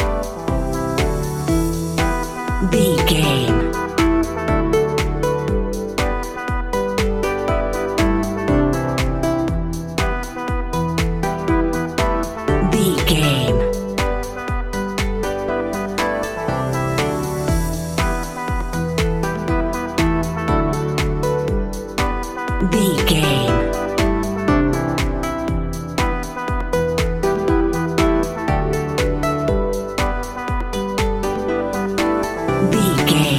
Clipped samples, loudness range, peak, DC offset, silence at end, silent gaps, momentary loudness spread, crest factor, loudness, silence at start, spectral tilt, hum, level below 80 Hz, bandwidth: under 0.1%; 3 LU; -2 dBFS; 0.2%; 0 s; none; 7 LU; 16 dB; -20 LUFS; 0 s; -5.5 dB/octave; none; -26 dBFS; 16.5 kHz